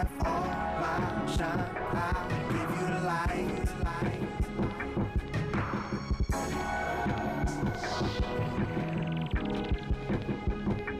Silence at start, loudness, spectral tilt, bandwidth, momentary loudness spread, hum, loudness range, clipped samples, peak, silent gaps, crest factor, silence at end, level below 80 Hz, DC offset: 0 s; -32 LUFS; -6.5 dB/octave; 15.5 kHz; 3 LU; none; 1 LU; under 0.1%; -22 dBFS; none; 10 dB; 0 s; -38 dBFS; under 0.1%